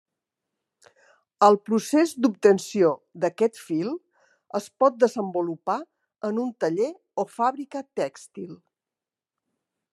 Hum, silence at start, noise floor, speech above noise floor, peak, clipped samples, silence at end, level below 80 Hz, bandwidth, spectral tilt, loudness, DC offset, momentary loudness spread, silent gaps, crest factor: none; 1.4 s; under -90 dBFS; over 66 dB; -4 dBFS; under 0.1%; 1.4 s; -82 dBFS; 13 kHz; -5.5 dB/octave; -24 LUFS; under 0.1%; 13 LU; none; 22 dB